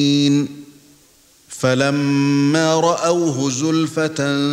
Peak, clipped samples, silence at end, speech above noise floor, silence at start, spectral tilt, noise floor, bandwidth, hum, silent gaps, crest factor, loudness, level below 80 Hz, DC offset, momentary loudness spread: -2 dBFS; under 0.1%; 0 s; 35 dB; 0 s; -5 dB/octave; -52 dBFS; 13.5 kHz; none; none; 14 dB; -17 LUFS; -62 dBFS; under 0.1%; 5 LU